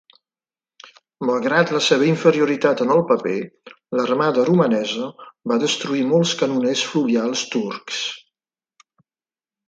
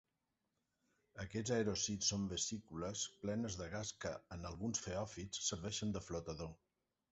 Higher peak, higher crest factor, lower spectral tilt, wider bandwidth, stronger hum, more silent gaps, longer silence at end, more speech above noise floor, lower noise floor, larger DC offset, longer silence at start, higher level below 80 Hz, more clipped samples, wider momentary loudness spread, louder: first, 0 dBFS vs -26 dBFS; about the same, 20 dB vs 18 dB; about the same, -4.5 dB/octave vs -4.5 dB/octave; first, 9.2 kHz vs 8 kHz; neither; neither; first, 1.5 s vs 0.55 s; first, over 71 dB vs 45 dB; about the same, under -90 dBFS vs -88 dBFS; neither; about the same, 1.2 s vs 1.15 s; second, -68 dBFS vs -62 dBFS; neither; about the same, 10 LU vs 11 LU; first, -19 LUFS vs -42 LUFS